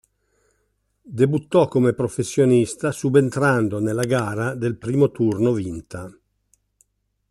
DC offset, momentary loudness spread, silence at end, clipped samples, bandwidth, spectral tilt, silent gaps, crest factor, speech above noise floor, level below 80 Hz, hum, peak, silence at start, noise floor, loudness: under 0.1%; 13 LU; 1.2 s; under 0.1%; 13 kHz; -7 dB/octave; none; 18 dB; 50 dB; -56 dBFS; 50 Hz at -55 dBFS; -4 dBFS; 1.05 s; -69 dBFS; -20 LUFS